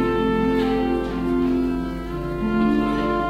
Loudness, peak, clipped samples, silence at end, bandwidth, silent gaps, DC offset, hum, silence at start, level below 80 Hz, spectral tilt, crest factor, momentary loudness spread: -22 LUFS; -8 dBFS; under 0.1%; 0 s; 13.5 kHz; none; under 0.1%; none; 0 s; -34 dBFS; -7.5 dB/octave; 12 dB; 7 LU